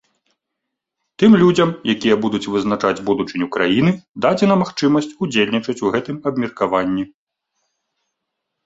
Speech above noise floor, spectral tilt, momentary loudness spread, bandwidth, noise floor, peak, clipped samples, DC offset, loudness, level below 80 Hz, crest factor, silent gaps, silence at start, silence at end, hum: 63 dB; -6 dB/octave; 9 LU; 8 kHz; -79 dBFS; 0 dBFS; under 0.1%; under 0.1%; -17 LUFS; -54 dBFS; 18 dB; 4.09-4.14 s; 1.2 s; 1.6 s; none